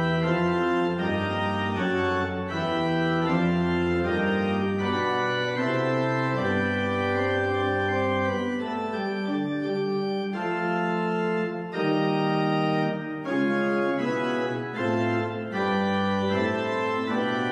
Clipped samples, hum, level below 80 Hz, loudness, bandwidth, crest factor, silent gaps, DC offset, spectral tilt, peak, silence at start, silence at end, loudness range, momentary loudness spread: under 0.1%; none; -62 dBFS; -26 LUFS; 10 kHz; 14 dB; none; under 0.1%; -7 dB/octave; -12 dBFS; 0 s; 0 s; 2 LU; 4 LU